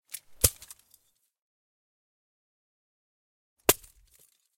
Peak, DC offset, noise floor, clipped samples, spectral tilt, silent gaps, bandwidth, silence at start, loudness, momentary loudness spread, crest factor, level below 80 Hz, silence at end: -4 dBFS; under 0.1%; -67 dBFS; under 0.1%; -2 dB/octave; 1.42-3.56 s; 16.5 kHz; 0.45 s; -27 LUFS; 22 LU; 32 dB; -52 dBFS; 0.8 s